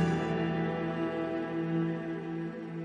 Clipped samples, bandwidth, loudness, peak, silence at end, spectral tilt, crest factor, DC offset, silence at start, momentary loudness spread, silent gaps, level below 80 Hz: under 0.1%; 9.4 kHz; -33 LUFS; -18 dBFS; 0 s; -8 dB/octave; 14 dB; under 0.1%; 0 s; 6 LU; none; -60 dBFS